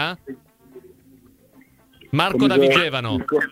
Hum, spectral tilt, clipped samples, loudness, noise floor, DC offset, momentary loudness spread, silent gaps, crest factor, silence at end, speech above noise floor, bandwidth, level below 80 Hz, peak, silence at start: none; -5.5 dB/octave; under 0.1%; -18 LUFS; -53 dBFS; under 0.1%; 22 LU; none; 20 dB; 0.05 s; 34 dB; 16 kHz; -54 dBFS; -2 dBFS; 0 s